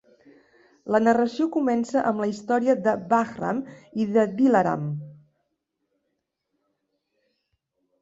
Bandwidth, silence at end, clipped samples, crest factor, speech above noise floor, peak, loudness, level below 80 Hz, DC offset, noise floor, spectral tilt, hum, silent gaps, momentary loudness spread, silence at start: 8 kHz; 2.9 s; under 0.1%; 18 dB; 56 dB; -8 dBFS; -23 LUFS; -68 dBFS; under 0.1%; -78 dBFS; -7 dB/octave; none; none; 11 LU; 0.85 s